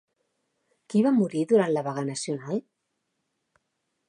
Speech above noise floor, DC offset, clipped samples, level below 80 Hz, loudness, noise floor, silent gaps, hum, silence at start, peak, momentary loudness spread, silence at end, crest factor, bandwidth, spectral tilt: 54 dB; under 0.1%; under 0.1%; -80 dBFS; -26 LUFS; -79 dBFS; none; none; 0.9 s; -10 dBFS; 10 LU; 1.5 s; 18 dB; 10.5 kHz; -6 dB/octave